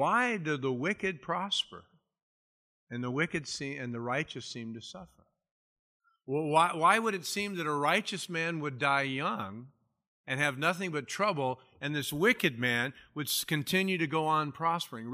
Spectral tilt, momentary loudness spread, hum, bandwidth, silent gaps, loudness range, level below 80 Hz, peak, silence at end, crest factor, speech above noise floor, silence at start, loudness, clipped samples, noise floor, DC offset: -4 dB/octave; 12 LU; none; 15.5 kHz; 2.23-2.87 s, 5.51-6.00 s, 10.07-10.24 s; 7 LU; -72 dBFS; -10 dBFS; 0 s; 22 dB; over 58 dB; 0 s; -31 LUFS; under 0.1%; under -90 dBFS; under 0.1%